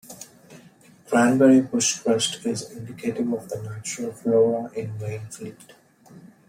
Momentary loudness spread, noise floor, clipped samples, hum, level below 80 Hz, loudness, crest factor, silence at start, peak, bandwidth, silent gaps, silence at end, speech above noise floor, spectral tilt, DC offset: 21 LU; -52 dBFS; under 0.1%; none; -68 dBFS; -23 LUFS; 18 dB; 0.1 s; -6 dBFS; 16 kHz; none; 0.2 s; 29 dB; -4.5 dB/octave; under 0.1%